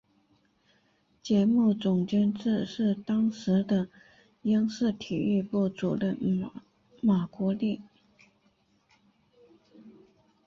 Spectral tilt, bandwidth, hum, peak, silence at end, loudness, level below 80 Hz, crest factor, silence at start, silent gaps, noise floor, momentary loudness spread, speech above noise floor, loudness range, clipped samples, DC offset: -8 dB/octave; 7.2 kHz; none; -14 dBFS; 0.55 s; -28 LUFS; -66 dBFS; 14 dB; 1.25 s; none; -68 dBFS; 8 LU; 42 dB; 7 LU; under 0.1%; under 0.1%